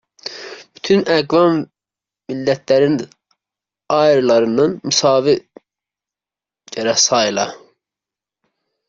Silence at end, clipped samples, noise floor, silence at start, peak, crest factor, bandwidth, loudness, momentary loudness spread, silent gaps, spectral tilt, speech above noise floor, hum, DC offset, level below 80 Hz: 1.3 s; under 0.1%; -89 dBFS; 0.25 s; -2 dBFS; 16 dB; 7.8 kHz; -15 LUFS; 17 LU; none; -3.5 dB/octave; 75 dB; none; under 0.1%; -60 dBFS